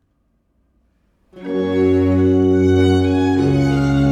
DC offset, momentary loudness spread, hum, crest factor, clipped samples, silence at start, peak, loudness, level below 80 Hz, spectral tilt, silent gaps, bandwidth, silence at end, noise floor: under 0.1%; 7 LU; none; 12 dB; under 0.1%; 1.35 s; -4 dBFS; -15 LUFS; -38 dBFS; -8 dB/octave; none; 9.4 kHz; 0 s; -64 dBFS